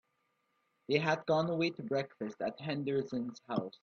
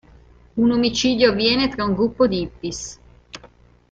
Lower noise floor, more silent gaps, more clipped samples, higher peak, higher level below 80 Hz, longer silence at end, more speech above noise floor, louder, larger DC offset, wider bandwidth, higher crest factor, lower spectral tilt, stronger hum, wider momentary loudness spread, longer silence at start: first, -79 dBFS vs -50 dBFS; neither; neither; second, -16 dBFS vs -2 dBFS; second, -76 dBFS vs -44 dBFS; second, 0.15 s vs 0.45 s; first, 45 dB vs 31 dB; second, -35 LUFS vs -19 LUFS; neither; second, 7.2 kHz vs 8 kHz; about the same, 20 dB vs 18 dB; first, -6.5 dB/octave vs -4.5 dB/octave; second, none vs 60 Hz at -40 dBFS; second, 8 LU vs 24 LU; first, 0.9 s vs 0.55 s